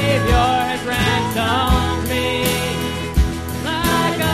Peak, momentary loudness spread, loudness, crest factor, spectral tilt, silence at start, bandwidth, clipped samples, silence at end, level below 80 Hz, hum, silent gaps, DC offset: -4 dBFS; 6 LU; -18 LUFS; 14 dB; -4.5 dB/octave; 0 s; 15.5 kHz; under 0.1%; 0 s; -26 dBFS; none; none; 0.4%